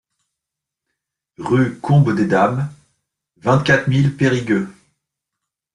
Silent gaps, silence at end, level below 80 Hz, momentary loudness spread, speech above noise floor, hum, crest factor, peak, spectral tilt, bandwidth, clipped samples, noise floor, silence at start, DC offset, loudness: none; 1.05 s; -52 dBFS; 10 LU; 68 dB; none; 16 dB; -2 dBFS; -7 dB/octave; 10.5 kHz; under 0.1%; -83 dBFS; 1.4 s; under 0.1%; -17 LUFS